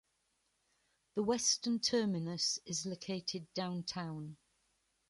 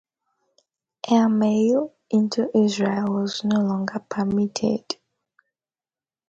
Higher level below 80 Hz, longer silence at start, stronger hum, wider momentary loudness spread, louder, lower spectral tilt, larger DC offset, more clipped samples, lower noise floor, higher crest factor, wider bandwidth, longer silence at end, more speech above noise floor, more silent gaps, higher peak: second, -76 dBFS vs -64 dBFS; about the same, 1.15 s vs 1.05 s; neither; about the same, 11 LU vs 9 LU; second, -36 LUFS vs -22 LUFS; second, -3.5 dB/octave vs -6 dB/octave; neither; neither; second, -80 dBFS vs under -90 dBFS; about the same, 20 dB vs 18 dB; first, 11.5 kHz vs 7.8 kHz; second, 0.75 s vs 1.35 s; second, 43 dB vs over 69 dB; neither; second, -20 dBFS vs -6 dBFS